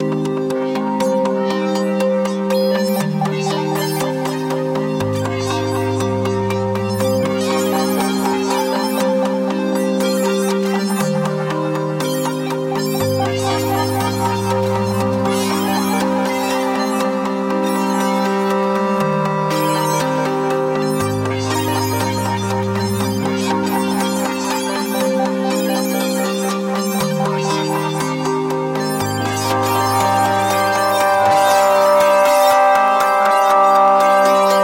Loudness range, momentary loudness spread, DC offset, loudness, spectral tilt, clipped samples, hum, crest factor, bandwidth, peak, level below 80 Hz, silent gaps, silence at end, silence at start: 6 LU; 7 LU; under 0.1%; -17 LUFS; -5 dB/octave; under 0.1%; none; 16 dB; 17 kHz; 0 dBFS; -54 dBFS; none; 0 s; 0 s